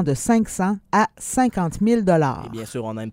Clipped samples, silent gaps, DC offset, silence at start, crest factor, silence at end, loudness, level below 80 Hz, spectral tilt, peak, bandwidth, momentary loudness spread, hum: under 0.1%; none; under 0.1%; 0 s; 16 dB; 0 s; -21 LUFS; -46 dBFS; -6 dB/octave; -4 dBFS; 16 kHz; 11 LU; none